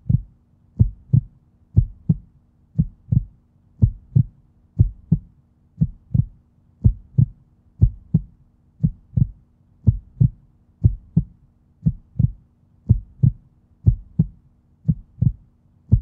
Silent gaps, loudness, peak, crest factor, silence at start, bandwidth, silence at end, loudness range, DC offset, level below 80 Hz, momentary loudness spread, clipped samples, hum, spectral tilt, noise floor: none; -23 LUFS; -2 dBFS; 20 dB; 0.1 s; 1 kHz; 0 s; 0 LU; under 0.1%; -30 dBFS; 5 LU; under 0.1%; none; -15 dB/octave; -56 dBFS